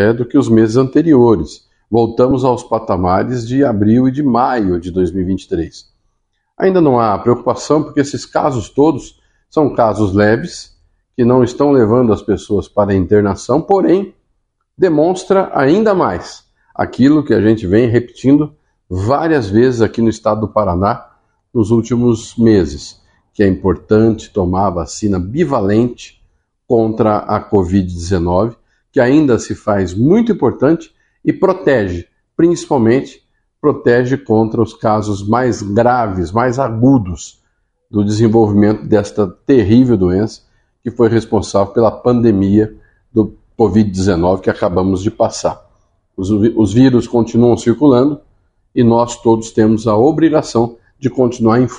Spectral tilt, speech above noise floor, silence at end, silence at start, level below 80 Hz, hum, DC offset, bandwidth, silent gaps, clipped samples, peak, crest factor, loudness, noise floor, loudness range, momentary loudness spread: -7.5 dB/octave; 53 dB; 0 s; 0 s; -40 dBFS; none; under 0.1%; 9.8 kHz; none; under 0.1%; 0 dBFS; 14 dB; -13 LUFS; -66 dBFS; 3 LU; 10 LU